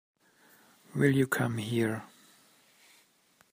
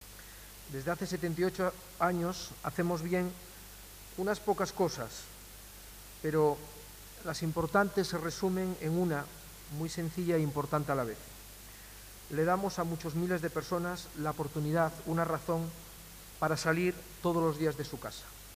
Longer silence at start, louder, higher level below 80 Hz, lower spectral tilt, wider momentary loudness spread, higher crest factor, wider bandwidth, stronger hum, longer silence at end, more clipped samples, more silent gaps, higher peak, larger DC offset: first, 0.95 s vs 0 s; first, -30 LUFS vs -34 LUFS; second, -70 dBFS vs -56 dBFS; about the same, -6 dB/octave vs -5.5 dB/octave; second, 12 LU vs 18 LU; about the same, 22 dB vs 20 dB; about the same, 15.5 kHz vs 15.5 kHz; neither; first, 1.45 s vs 0 s; neither; neither; about the same, -12 dBFS vs -14 dBFS; neither